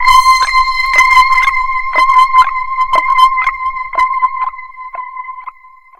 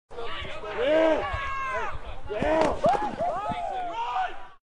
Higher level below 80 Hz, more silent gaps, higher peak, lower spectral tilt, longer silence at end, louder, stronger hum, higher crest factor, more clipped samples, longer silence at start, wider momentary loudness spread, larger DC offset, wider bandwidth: first, -34 dBFS vs -42 dBFS; neither; first, 0 dBFS vs -8 dBFS; second, 0.5 dB/octave vs -5.5 dB/octave; first, 0.5 s vs 0.05 s; first, -10 LUFS vs -27 LUFS; neither; second, 12 dB vs 18 dB; first, 0.4% vs under 0.1%; about the same, 0 s vs 0.1 s; first, 18 LU vs 13 LU; neither; first, 16.5 kHz vs 10.5 kHz